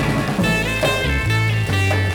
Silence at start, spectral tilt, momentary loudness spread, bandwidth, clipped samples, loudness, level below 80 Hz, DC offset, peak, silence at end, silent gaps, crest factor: 0 s; -5.5 dB/octave; 1 LU; 18.5 kHz; under 0.1%; -18 LUFS; -30 dBFS; under 0.1%; -6 dBFS; 0 s; none; 12 dB